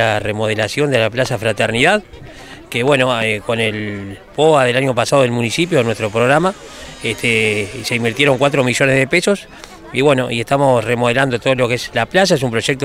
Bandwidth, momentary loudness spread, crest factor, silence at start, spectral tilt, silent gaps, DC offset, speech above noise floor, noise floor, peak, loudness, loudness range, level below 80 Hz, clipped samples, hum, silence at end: 16 kHz; 10 LU; 16 dB; 0 s; -4.5 dB/octave; none; under 0.1%; 20 dB; -35 dBFS; 0 dBFS; -15 LUFS; 1 LU; -46 dBFS; under 0.1%; none; 0 s